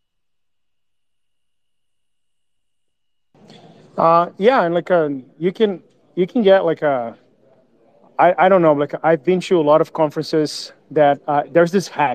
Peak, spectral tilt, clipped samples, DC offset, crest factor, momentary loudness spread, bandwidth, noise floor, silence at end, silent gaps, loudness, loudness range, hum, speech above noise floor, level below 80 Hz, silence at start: -2 dBFS; -6 dB/octave; under 0.1%; under 0.1%; 18 dB; 10 LU; 13.5 kHz; -82 dBFS; 0 s; none; -17 LUFS; 4 LU; none; 66 dB; -68 dBFS; 3.95 s